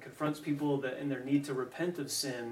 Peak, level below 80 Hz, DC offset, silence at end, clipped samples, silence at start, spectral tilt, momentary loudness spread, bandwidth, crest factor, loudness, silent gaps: -18 dBFS; -78 dBFS; under 0.1%; 0 s; under 0.1%; 0 s; -4.5 dB/octave; 4 LU; 16 kHz; 16 dB; -35 LUFS; none